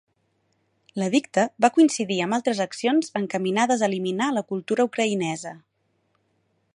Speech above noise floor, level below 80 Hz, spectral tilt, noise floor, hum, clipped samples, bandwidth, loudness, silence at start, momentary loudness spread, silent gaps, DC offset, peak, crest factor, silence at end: 47 dB; -74 dBFS; -4.5 dB/octave; -70 dBFS; none; under 0.1%; 11.5 kHz; -23 LUFS; 0.95 s; 8 LU; none; under 0.1%; -4 dBFS; 20 dB; 1.15 s